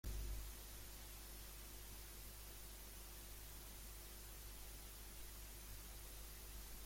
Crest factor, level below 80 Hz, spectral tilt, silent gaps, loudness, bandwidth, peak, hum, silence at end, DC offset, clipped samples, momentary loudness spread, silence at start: 16 dB; -56 dBFS; -3 dB/octave; none; -55 LUFS; 16.5 kHz; -38 dBFS; 50 Hz at -60 dBFS; 0 s; under 0.1%; under 0.1%; 2 LU; 0.05 s